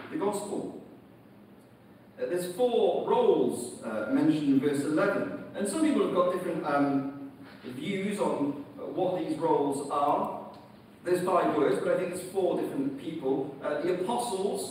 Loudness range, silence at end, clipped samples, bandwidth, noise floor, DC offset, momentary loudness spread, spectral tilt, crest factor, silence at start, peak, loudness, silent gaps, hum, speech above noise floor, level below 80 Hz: 3 LU; 0 s; under 0.1%; 16 kHz; -54 dBFS; under 0.1%; 12 LU; -5.5 dB/octave; 18 dB; 0 s; -12 dBFS; -29 LUFS; none; none; 26 dB; -72 dBFS